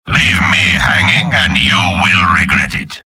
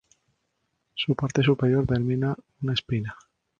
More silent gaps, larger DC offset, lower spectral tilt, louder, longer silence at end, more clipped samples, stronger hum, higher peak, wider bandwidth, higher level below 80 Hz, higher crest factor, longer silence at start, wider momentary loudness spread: neither; neither; second, -3.5 dB/octave vs -7 dB/octave; first, -10 LUFS vs -25 LUFS; second, 0.1 s vs 0.45 s; neither; neither; first, 0 dBFS vs -8 dBFS; first, 16.5 kHz vs 7.2 kHz; first, -30 dBFS vs -50 dBFS; second, 12 dB vs 18 dB; second, 0.05 s vs 0.95 s; second, 2 LU vs 9 LU